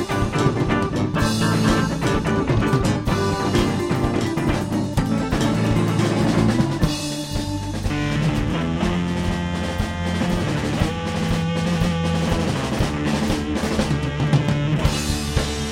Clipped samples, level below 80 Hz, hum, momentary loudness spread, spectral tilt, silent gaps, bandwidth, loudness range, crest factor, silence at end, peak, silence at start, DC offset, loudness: under 0.1%; -32 dBFS; none; 5 LU; -6 dB/octave; none; 16.5 kHz; 3 LU; 16 dB; 0 s; -4 dBFS; 0 s; under 0.1%; -21 LUFS